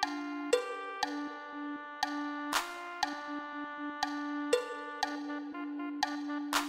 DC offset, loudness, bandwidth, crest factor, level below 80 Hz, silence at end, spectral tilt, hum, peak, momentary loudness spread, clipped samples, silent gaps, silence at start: under 0.1%; -36 LUFS; 16 kHz; 22 dB; -74 dBFS; 0 s; -1.5 dB/octave; none; -16 dBFS; 8 LU; under 0.1%; none; 0 s